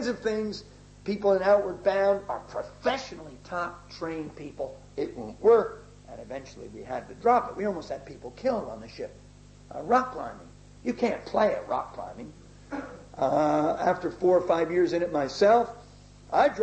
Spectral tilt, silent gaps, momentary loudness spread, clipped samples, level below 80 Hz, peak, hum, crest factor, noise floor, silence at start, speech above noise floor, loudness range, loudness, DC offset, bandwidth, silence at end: -6 dB/octave; none; 18 LU; under 0.1%; -56 dBFS; -10 dBFS; 50 Hz at -50 dBFS; 18 dB; -50 dBFS; 0 s; 23 dB; 7 LU; -27 LUFS; under 0.1%; 8.6 kHz; 0 s